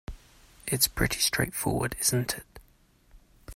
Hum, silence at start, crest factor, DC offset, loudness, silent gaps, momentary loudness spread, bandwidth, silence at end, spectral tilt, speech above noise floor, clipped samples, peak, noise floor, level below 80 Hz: none; 0.1 s; 22 dB; under 0.1%; -27 LUFS; none; 12 LU; 16 kHz; 0 s; -3 dB/octave; 34 dB; under 0.1%; -8 dBFS; -62 dBFS; -46 dBFS